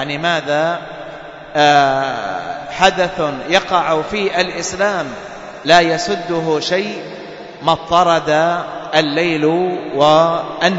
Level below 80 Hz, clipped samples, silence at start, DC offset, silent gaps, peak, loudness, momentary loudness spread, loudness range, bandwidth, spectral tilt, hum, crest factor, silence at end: -48 dBFS; under 0.1%; 0 s; under 0.1%; none; 0 dBFS; -15 LUFS; 15 LU; 2 LU; 8 kHz; -4 dB/octave; none; 16 dB; 0 s